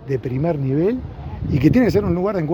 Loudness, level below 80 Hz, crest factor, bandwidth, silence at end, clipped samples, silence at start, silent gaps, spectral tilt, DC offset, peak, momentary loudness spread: -19 LUFS; -38 dBFS; 18 dB; 18 kHz; 0 s; under 0.1%; 0 s; none; -9 dB/octave; under 0.1%; -2 dBFS; 12 LU